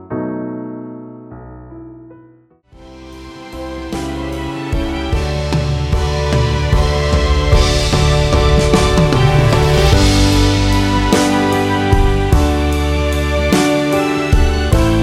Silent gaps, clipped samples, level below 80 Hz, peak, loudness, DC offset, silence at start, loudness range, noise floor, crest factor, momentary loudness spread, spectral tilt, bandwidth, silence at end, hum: none; under 0.1%; -18 dBFS; 0 dBFS; -14 LUFS; under 0.1%; 0 s; 16 LU; -47 dBFS; 14 dB; 19 LU; -5.5 dB/octave; 15.5 kHz; 0 s; none